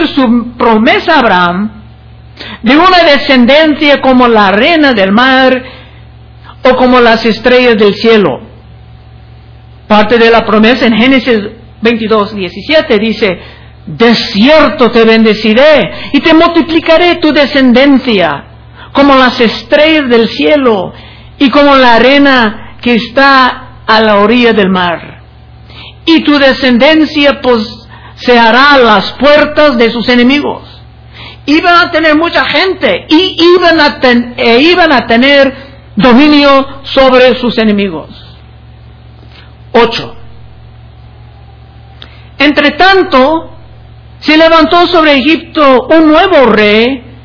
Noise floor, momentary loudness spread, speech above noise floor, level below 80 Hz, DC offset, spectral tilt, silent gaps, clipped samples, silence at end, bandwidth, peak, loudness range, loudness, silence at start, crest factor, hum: -33 dBFS; 8 LU; 27 dB; -34 dBFS; under 0.1%; -6 dB/octave; none; 6%; 0.15 s; 5.4 kHz; 0 dBFS; 5 LU; -6 LUFS; 0 s; 6 dB; none